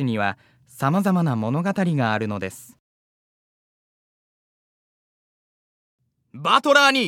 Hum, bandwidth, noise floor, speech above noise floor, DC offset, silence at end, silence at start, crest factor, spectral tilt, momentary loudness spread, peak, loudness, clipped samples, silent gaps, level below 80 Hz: none; 16 kHz; under -90 dBFS; over 69 dB; under 0.1%; 0 s; 0 s; 22 dB; -5 dB/octave; 13 LU; -2 dBFS; -21 LUFS; under 0.1%; 2.79-5.98 s; -74 dBFS